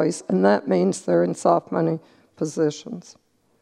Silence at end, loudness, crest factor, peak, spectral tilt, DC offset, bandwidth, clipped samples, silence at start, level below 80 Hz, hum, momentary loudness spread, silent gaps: 0.6 s; -22 LUFS; 20 dB; -4 dBFS; -6.5 dB/octave; under 0.1%; 11 kHz; under 0.1%; 0 s; -70 dBFS; none; 13 LU; none